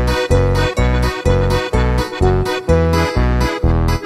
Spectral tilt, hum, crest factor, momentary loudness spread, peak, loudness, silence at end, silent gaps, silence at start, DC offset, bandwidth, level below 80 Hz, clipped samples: -6.5 dB/octave; none; 14 dB; 2 LU; -2 dBFS; -16 LUFS; 0 s; none; 0 s; under 0.1%; 14 kHz; -20 dBFS; under 0.1%